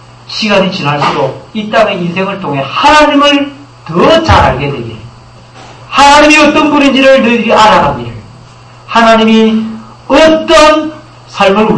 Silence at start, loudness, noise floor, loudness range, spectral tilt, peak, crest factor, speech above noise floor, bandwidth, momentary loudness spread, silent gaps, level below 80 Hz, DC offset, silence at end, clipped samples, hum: 0.3 s; -7 LUFS; -34 dBFS; 3 LU; -4.5 dB/octave; 0 dBFS; 8 dB; 27 dB; 11 kHz; 15 LU; none; -30 dBFS; under 0.1%; 0 s; 3%; none